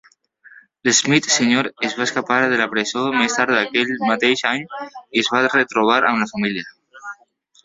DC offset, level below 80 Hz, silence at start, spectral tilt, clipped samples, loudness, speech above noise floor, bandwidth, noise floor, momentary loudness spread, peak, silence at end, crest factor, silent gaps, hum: under 0.1%; -62 dBFS; 0.55 s; -2.5 dB/octave; under 0.1%; -18 LUFS; 38 dB; 8 kHz; -56 dBFS; 15 LU; -2 dBFS; 0.5 s; 18 dB; none; none